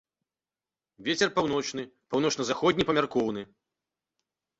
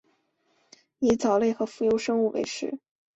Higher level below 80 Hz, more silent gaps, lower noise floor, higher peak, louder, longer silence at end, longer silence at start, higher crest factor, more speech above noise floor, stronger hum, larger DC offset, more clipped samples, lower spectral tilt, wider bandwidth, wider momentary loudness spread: about the same, -62 dBFS vs -62 dBFS; neither; first, under -90 dBFS vs -70 dBFS; about the same, -8 dBFS vs -10 dBFS; about the same, -27 LUFS vs -26 LUFS; first, 1.15 s vs 0.4 s; about the same, 1 s vs 1 s; first, 22 dB vs 16 dB; first, over 62 dB vs 45 dB; neither; neither; neither; about the same, -4 dB/octave vs -5 dB/octave; about the same, 8.2 kHz vs 8.2 kHz; about the same, 12 LU vs 11 LU